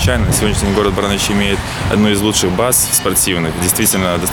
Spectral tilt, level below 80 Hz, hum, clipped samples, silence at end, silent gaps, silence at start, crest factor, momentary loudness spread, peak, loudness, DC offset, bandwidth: -3.5 dB/octave; -26 dBFS; none; under 0.1%; 0 s; none; 0 s; 14 dB; 4 LU; 0 dBFS; -13 LUFS; under 0.1%; over 20 kHz